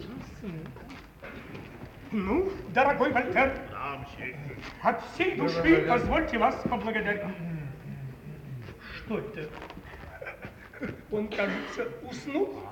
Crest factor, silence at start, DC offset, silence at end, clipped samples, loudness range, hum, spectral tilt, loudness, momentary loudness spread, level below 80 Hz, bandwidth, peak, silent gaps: 22 dB; 0 s; under 0.1%; 0 s; under 0.1%; 12 LU; none; -6.5 dB/octave; -29 LUFS; 19 LU; -50 dBFS; 18 kHz; -8 dBFS; none